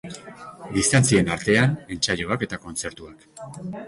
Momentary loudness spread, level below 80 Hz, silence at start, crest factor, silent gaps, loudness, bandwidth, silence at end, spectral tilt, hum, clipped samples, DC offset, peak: 22 LU; -48 dBFS; 0.05 s; 20 dB; none; -22 LUFS; 11.5 kHz; 0 s; -4.5 dB/octave; none; under 0.1%; under 0.1%; -4 dBFS